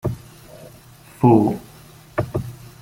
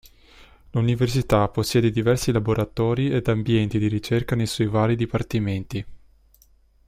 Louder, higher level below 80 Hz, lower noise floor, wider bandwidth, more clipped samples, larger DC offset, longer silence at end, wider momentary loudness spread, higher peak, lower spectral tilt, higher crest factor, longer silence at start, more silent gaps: first, -20 LUFS vs -23 LUFS; about the same, -48 dBFS vs -44 dBFS; second, -45 dBFS vs -57 dBFS; about the same, 17 kHz vs 15.5 kHz; neither; neither; second, 0.3 s vs 0.9 s; first, 23 LU vs 6 LU; about the same, -2 dBFS vs -4 dBFS; first, -8.5 dB/octave vs -6.5 dB/octave; about the same, 20 dB vs 18 dB; second, 0.05 s vs 0.75 s; neither